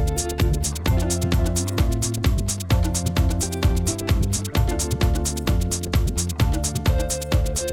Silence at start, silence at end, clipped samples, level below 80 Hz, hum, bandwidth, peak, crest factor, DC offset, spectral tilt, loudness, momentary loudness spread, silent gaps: 0 s; 0 s; under 0.1%; -24 dBFS; none; 17.5 kHz; -8 dBFS; 14 dB; under 0.1%; -4.5 dB/octave; -23 LUFS; 2 LU; none